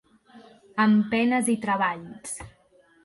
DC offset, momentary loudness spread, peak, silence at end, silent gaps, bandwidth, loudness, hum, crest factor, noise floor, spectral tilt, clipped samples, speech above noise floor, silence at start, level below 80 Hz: under 0.1%; 15 LU; -10 dBFS; 0.55 s; none; 12 kHz; -24 LUFS; none; 16 dB; -60 dBFS; -5 dB/octave; under 0.1%; 36 dB; 0.35 s; -60 dBFS